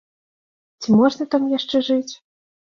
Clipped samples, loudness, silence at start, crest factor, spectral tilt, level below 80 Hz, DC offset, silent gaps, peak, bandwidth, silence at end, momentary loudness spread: under 0.1%; -19 LUFS; 0.8 s; 18 dB; -6 dB/octave; -64 dBFS; under 0.1%; none; -4 dBFS; 7.2 kHz; 0.55 s; 11 LU